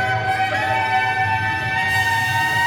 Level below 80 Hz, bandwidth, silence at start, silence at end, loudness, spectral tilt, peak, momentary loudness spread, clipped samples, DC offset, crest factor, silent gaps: -48 dBFS; over 20 kHz; 0 s; 0 s; -18 LUFS; -3.5 dB/octave; -6 dBFS; 3 LU; under 0.1%; under 0.1%; 12 dB; none